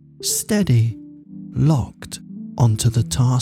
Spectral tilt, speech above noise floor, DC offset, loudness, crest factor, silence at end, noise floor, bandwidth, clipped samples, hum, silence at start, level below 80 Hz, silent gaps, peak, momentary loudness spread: -5.5 dB/octave; 19 dB; under 0.1%; -19 LUFS; 14 dB; 0 s; -37 dBFS; 16 kHz; under 0.1%; none; 0.2 s; -42 dBFS; none; -6 dBFS; 17 LU